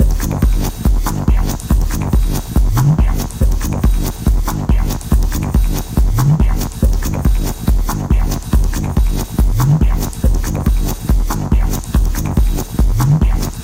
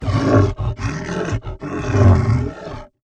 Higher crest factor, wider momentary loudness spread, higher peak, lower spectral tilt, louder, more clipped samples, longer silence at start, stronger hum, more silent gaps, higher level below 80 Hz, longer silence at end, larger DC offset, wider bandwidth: second, 12 dB vs 18 dB; second, 4 LU vs 14 LU; about the same, -2 dBFS vs 0 dBFS; about the same, -6.5 dB/octave vs -7.5 dB/octave; about the same, -16 LUFS vs -18 LUFS; neither; about the same, 0 s vs 0 s; neither; neither; first, -14 dBFS vs -30 dBFS; second, 0 s vs 0.2 s; neither; first, 16.5 kHz vs 8.2 kHz